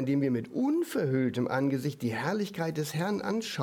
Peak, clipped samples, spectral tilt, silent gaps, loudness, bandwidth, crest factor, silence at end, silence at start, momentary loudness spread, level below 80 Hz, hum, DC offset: -14 dBFS; under 0.1%; -6.5 dB/octave; none; -30 LUFS; 18.5 kHz; 16 dB; 0 s; 0 s; 4 LU; -72 dBFS; none; under 0.1%